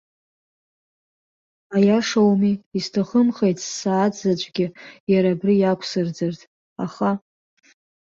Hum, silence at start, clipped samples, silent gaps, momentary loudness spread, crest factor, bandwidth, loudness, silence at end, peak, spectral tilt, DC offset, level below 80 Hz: none; 1.7 s; under 0.1%; 2.66-2.71 s, 5.00-5.07 s, 6.47-6.76 s; 10 LU; 16 dB; 7.6 kHz; -21 LUFS; 0.9 s; -6 dBFS; -6 dB/octave; under 0.1%; -64 dBFS